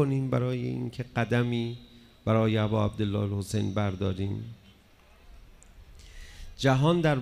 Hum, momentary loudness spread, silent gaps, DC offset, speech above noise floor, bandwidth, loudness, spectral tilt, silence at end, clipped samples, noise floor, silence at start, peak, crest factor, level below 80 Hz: none; 19 LU; none; under 0.1%; 30 dB; 13.5 kHz; -28 LUFS; -7 dB/octave; 0 s; under 0.1%; -57 dBFS; 0 s; -10 dBFS; 20 dB; -52 dBFS